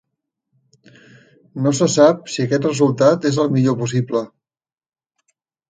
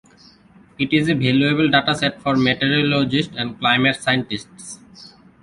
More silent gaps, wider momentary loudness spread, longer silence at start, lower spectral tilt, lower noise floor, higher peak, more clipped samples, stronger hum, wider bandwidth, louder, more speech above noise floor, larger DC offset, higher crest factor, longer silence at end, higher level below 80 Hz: neither; second, 10 LU vs 13 LU; first, 1.55 s vs 0.8 s; about the same, -6 dB/octave vs -5.5 dB/octave; first, -78 dBFS vs -50 dBFS; about the same, 0 dBFS vs -2 dBFS; neither; neither; second, 9.6 kHz vs 11.5 kHz; about the same, -17 LUFS vs -18 LUFS; first, 62 dB vs 31 dB; neither; about the same, 18 dB vs 18 dB; first, 1.45 s vs 0.35 s; second, -62 dBFS vs -52 dBFS